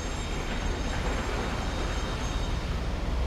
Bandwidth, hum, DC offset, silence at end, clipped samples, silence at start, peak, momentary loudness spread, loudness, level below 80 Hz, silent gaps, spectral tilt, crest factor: 13.5 kHz; none; under 0.1%; 0 s; under 0.1%; 0 s; -18 dBFS; 2 LU; -32 LUFS; -32 dBFS; none; -5 dB/octave; 12 dB